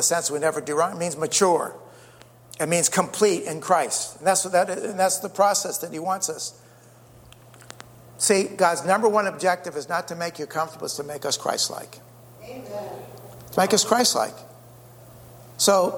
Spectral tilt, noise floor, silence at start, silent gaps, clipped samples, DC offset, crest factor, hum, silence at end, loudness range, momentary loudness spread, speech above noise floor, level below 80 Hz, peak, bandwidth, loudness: -2.5 dB/octave; -50 dBFS; 0 s; none; under 0.1%; under 0.1%; 20 dB; none; 0 s; 5 LU; 18 LU; 27 dB; -66 dBFS; -4 dBFS; over 20 kHz; -23 LUFS